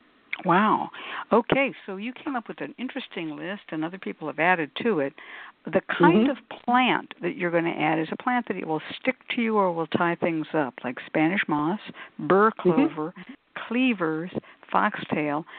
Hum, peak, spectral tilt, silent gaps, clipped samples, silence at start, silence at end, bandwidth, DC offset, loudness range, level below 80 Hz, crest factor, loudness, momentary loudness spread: none; -4 dBFS; -10.5 dB/octave; none; under 0.1%; 0.3 s; 0 s; 4.5 kHz; under 0.1%; 5 LU; -68 dBFS; 20 dB; -25 LUFS; 14 LU